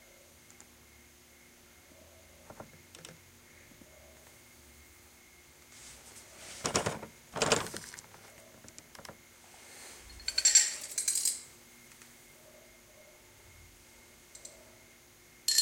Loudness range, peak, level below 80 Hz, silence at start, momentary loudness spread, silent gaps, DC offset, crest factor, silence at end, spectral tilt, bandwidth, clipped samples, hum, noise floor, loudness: 24 LU; -8 dBFS; -64 dBFS; 2.5 s; 27 LU; none; under 0.1%; 30 dB; 0 s; -0.5 dB/octave; 16.5 kHz; under 0.1%; none; -59 dBFS; -29 LUFS